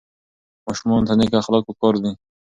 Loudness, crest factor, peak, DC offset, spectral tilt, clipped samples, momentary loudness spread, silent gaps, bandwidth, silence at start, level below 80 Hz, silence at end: -19 LUFS; 18 dB; -2 dBFS; under 0.1%; -6.5 dB/octave; under 0.1%; 11 LU; none; 7.8 kHz; 0.65 s; -48 dBFS; 0.3 s